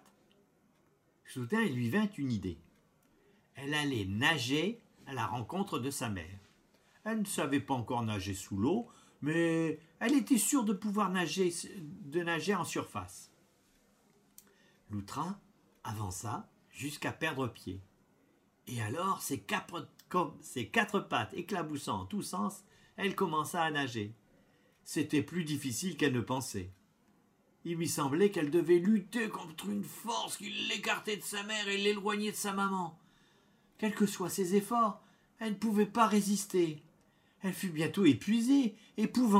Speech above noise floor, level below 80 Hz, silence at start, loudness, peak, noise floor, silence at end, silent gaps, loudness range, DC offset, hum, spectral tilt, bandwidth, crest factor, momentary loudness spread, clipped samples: 38 dB; -72 dBFS; 1.25 s; -34 LUFS; -12 dBFS; -71 dBFS; 0 s; none; 8 LU; under 0.1%; none; -4.5 dB/octave; 16 kHz; 22 dB; 15 LU; under 0.1%